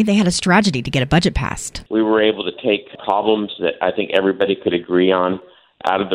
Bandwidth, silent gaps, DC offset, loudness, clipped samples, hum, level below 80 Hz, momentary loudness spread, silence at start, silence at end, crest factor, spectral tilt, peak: 15 kHz; none; under 0.1%; -18 LUFS; under 0.1%; none; -38 dBFS; 7 LU; 0 s; 0 s; 16 dB; -5 dB/octave; -2 dBFS